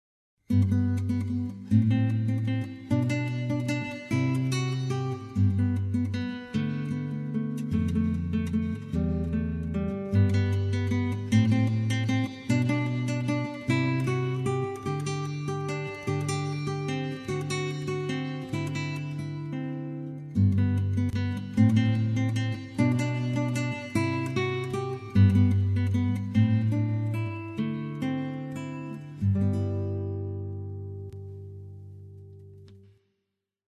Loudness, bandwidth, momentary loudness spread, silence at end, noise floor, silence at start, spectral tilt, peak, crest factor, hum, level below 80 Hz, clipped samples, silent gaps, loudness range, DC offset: -28 LUFS; 11.5 kHz; 10 LU; 0.9 s; -82 dBFS; 0.5 s; -7.5 dB/octave; -10 dBFS; 18 dB; none; -42 dBFS; under 0.1%; none; 6 LU; under 0.1%